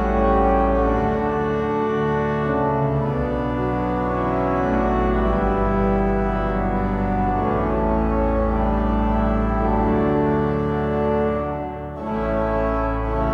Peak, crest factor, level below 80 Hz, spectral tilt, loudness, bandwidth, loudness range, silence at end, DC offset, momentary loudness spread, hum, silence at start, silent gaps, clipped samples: -6 dBFS; 14 dB; -28 dBFS; -9.5 dB/octave; -21 LUFS; 6.2 kHz; 1 LU; 0 s; under 0.1%; 4 LU; none; 0 s; none; under 0.1%